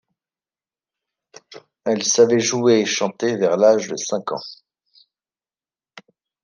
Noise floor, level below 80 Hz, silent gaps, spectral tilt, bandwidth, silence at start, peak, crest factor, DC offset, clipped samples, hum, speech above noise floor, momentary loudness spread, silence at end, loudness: under -90 dBFS; -72 dBFS; none; -3.5 dB/octave; 10.5 kHz; 1.5 s; -2 dBFS; 20 dB; under 0.1%; under 0.1%; none; over 72 dB; 14 LU; 0.45 s; -18 LUFS